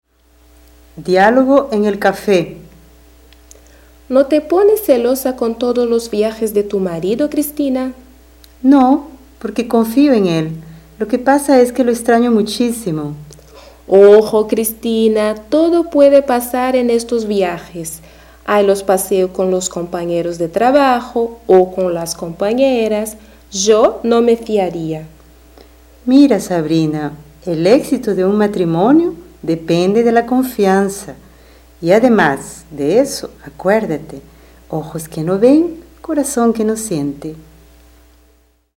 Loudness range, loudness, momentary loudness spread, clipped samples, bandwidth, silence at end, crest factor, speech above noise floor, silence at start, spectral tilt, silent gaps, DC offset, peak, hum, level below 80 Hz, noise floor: 4 LU; -14 LUFS; 14 LU; under 0.1%; 17 kHz; 1.4 s; 14 dB; 40 dB; 0.95 s; -5.5 dB/octave; none; under 0.1%; 0 dBFS; none; -46 dBFS; -53 dBFS